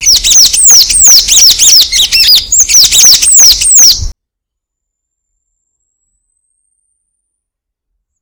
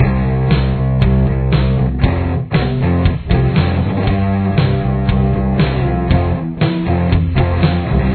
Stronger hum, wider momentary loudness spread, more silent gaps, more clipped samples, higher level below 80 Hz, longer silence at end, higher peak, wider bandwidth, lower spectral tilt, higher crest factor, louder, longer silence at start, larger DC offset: neither; about the same, 3 LU vs 3 LU; neither; first, 9% vs under 0.1%; second, -30 dBFS vs -20 dBFS; first, 4.1 s vs 0 s; about the same, 0 dBFS vs 0 dBFS; first, over 20 kHz vs 4.5 kHz; second, 3 dB/octave vs -11.5 dB/octave; second, 8 dB vs 14 dB; first, -1 LUFS vs -15 LUFS; about the same, 0 s vs 0 s; neither